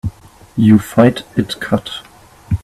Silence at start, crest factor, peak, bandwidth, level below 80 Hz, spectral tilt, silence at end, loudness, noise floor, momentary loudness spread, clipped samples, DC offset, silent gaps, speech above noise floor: 0.05 s; 16 dB; 0 dBFS; 14 kHz; -40 dBFS; -7 dB/octave; 0.05 s; -14 LUFS; -32 dBFS; 17 LU; under 0.1%; under 0.1%; none; 19 dB